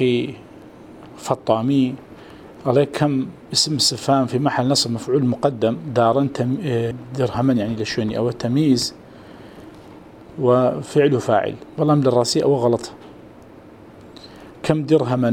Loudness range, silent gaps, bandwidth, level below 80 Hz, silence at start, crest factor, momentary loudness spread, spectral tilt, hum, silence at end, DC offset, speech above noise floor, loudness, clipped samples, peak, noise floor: 3 LU; none; 18 kHz; -54 dBFS; 0 s; 20 dB; 11 LU; -5.5 dB/octave; none; 0 s; under 0.1%; 24 dB; -19 LUFS; under 0.1%; 0 dBFS; -43 dBFS